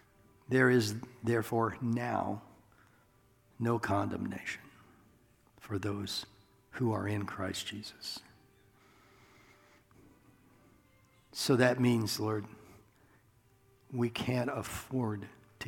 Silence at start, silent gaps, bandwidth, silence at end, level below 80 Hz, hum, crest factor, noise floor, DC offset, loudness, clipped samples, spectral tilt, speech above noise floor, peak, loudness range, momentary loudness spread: 0.5 s; none; 18.5 kHz; 0 s; -68 dBFS; none; 24 dB; -67 dBFS; under 0.1%; -34 LUFS; under 0.1%; -5.5 dB/octave; 34 dB; -10 dBFS; 9 LU; 16 LU